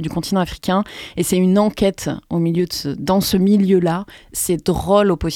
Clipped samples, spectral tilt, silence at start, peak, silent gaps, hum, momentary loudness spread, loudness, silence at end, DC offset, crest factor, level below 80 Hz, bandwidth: under 0.1%; -5.5 dB/octave; 0 s; -2 dBFS; none; none; 8 LU; -18 LUFS; 0 s; under 0.1%; 16 dB; -40 dBFS; 17 kHz